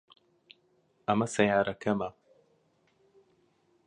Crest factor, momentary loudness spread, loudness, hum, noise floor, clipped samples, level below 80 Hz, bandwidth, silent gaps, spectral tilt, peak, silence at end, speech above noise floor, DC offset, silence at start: 24 dB; 11 LU; -29 LUFS; none; -70 dBFS; under 0.1%; -66 dBFS; 11 kHz; none; -5.5 dB/octave; -8 dBFS; 1.75 s; 42 dB; under 0.1%; 1.1 s